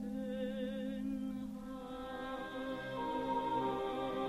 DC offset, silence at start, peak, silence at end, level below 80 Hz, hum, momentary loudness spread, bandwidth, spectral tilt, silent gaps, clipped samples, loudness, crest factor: under 0.1%; 0 s; -24 dBFS; 0 s; -60 dBFS; none; 9 LU; 13.5 kHz; -6.5 dB/octave; none; under 0.1%; -40 LUFS; 16 dB